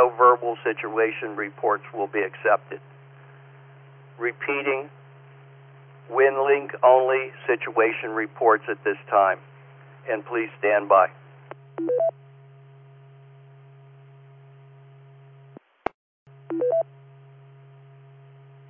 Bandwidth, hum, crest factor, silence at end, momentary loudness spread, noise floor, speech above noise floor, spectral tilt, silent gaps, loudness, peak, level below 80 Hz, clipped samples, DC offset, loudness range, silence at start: 3.6 kHz; none; 22 dB; 1.85 s; 17 LU; -50 dBFS; 27 dB; -9 dB/octave; 15.94-16.26 s; -23 LUFS; -4 dBFS; -74 dBFS; under 0.1%; under 0.1%; 11 LU; 0 s